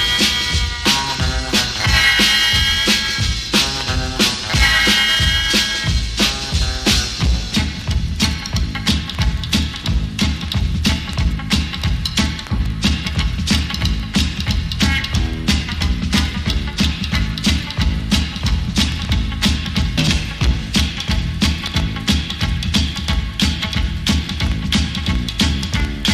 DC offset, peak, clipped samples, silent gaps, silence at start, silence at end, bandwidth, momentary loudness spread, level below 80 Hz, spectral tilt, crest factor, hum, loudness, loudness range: under 0.1%; 0 dBFS; under 0.1%; none; 0 s; 0 s; 15.5 kHz; 7 LU; -22 dBFS; -3.5 dB/octave; 16 dB; none; -17 LUFS; 5 LU